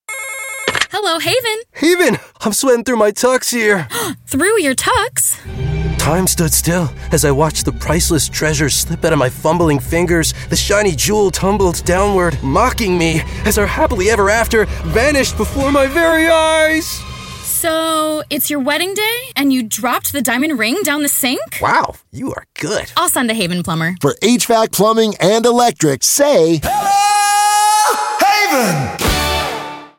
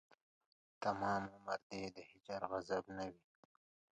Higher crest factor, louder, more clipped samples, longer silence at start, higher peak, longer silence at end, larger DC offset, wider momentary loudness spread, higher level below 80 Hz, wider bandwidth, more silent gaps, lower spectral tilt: second, 14 dB vs 22 dB; first, -14 LUFS vs -44 LUFS; neither; second, 0.1 s vs 0.8 s; first, 0 dBFS vs -24 dBFS; second, 0.1 s vs 0.8 s; neither; second, 7 LU vs 10 LU; first, -30 dBFS vs -74 dBFS; first, 17 kHz vs 9.8 kHz; second, none vs 1.63-1.70 s; second, -3.5 dB/octave vs -5.5 dB/octave